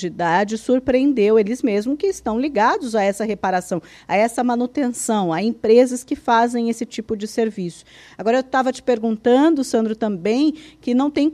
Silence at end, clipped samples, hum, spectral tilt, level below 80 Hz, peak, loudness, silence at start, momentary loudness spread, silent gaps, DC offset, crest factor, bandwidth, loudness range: 0 s; under 0.1%; none; -5 dB/octave; -54 dBFS; -2 dBFS; -19 LUFS; 0 s; 9 LU; none; under 0.1%; 16 dB; 13.5 kHz; 2 LU